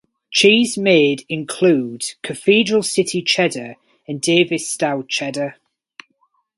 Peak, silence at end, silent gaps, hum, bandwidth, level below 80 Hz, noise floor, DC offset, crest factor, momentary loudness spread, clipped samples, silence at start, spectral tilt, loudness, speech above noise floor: 0 dBFS; 1.05 s; none; none; 11.5 kHz; -64 dBFS; -64 dBFS; under 0.1%; 18 dB; 12 LU; under 0.1%; 0.3 s; -3.5 dB/octave; -17 LUFS; 47 dB